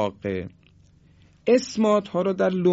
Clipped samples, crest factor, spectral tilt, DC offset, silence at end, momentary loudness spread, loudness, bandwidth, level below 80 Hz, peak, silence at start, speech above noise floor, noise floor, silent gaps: under 0.1%; 16 dB; -6.5 dB/octave; under 0.1%; 0 s; 10 LU; -23 LUFS; 8 kHz; -56 dBFS; -6 dBFS; 0 s; 33 dB; -55 dBFS; none